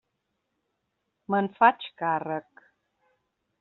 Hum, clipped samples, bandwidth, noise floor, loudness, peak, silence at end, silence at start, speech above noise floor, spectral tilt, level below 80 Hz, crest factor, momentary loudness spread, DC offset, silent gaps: none; under 0.1%; 4.2 kHz; -79 dBFS; -26 LUFS; -4 dBFS; 1.2 s; 1.3 s; 54 dB; -3.5 dB/octave; -78 dBFS; 24 dB; 12 LU; under 0.1%; none